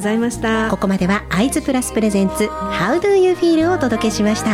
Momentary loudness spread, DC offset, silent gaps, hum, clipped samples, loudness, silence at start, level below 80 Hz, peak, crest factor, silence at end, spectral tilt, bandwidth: 4 LU; under 0.1%; none; none; under 0.1%; -17 LUFS; 0 s; -38 dBFS; -6 dBFS; 12 dB; 0 s; -5 dB/octave; 16 kHz